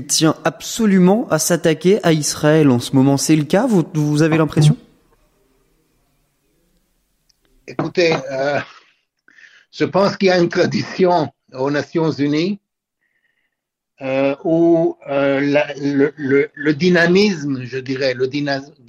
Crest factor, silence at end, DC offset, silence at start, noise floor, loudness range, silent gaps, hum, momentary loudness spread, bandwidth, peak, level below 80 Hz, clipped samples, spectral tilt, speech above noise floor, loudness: 14 dB; 0.25 s; under 0.1%; 0 s; -78 dBFS; 8 LU; none; none; 10 LU; 16 kHz; -2 dBFS; -56 dBFS; under 0.1%; -5.5 dB/octave; 62 dB; -16 LUFS